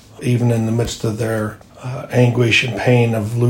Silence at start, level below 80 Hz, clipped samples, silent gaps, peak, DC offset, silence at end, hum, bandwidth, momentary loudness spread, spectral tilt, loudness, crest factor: 0.2 s; -44 dBFS; under 0.1%; none; -2 dBFS; under 0.1%; 0 s; none; 16 kHz; 13 LU; -6 dB/octave; -17 LUFS; 14 dB